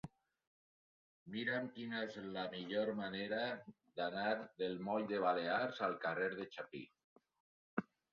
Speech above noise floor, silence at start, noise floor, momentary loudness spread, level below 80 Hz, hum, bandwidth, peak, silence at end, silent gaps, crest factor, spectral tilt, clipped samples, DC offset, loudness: over 49 dB; 0.05 s; under -90 dBFS; 12 LU; -80 dBFS; none; 6.8 kHz; -20 dBFS; 0.3 s; 0.47-1.26 s, 7.04-7.16 s, 7.40-7.77 s; 22 dB; -3 dB/octave; under 0.1%; under 0.1%; -41 LUFS